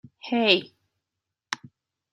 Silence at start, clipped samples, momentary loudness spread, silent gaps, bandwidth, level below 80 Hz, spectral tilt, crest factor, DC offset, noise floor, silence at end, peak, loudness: 0.25 s; under 0.1%; 15 LU; none; 12 kHz; -76 dBFS; -3.5 dB/octave; 24 dB; under 0.1%; -86 dBFS; 0.55 s; -4 dBFS; -22 LUFS